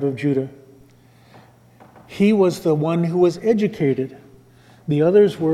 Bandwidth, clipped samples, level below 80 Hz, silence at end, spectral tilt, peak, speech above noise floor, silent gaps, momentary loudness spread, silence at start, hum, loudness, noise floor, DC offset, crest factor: 13 kHz; under 0.1%; -60 dBFS; 0 s; -8 dB/octave; -4 dBFS; 33 dB; none; 13 LU; 0 s; none; -18 LUFS; -51 dBFS; under 0.1%; 16 dB